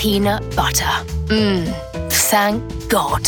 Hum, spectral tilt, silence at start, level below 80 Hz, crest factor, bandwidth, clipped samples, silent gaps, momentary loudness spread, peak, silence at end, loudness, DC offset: none; -3.5 dB/octave; 0 s; -30 dBFS; 16 dB; 19.5 kHz; under 0.1%; none; 8 LU; -2 dBFS; 0 s; -17 LUFS; under 0.1%